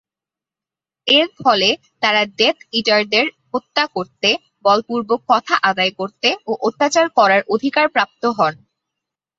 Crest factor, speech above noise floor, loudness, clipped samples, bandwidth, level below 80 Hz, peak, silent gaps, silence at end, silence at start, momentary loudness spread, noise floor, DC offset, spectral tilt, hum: 16 dB; 72 dB; -17 LUFS; under 0.1%; 8 kHz; -66 dBFS; -2 dBFS; none; 0.85 s; 1.05 s; 6 LU; -89 dBFS; under 0.1%; -3 dB/octave; none